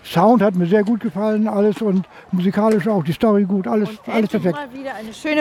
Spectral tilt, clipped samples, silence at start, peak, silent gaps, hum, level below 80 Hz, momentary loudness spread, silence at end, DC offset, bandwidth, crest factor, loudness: -7.5 dB/octave; under 0.1%; 0.05 s; -2 dBFS; none; none; -56 dBFS; 10 LU; 0 s; under 0.1%; 14.5 kHz; 16 dB; -18 LUFS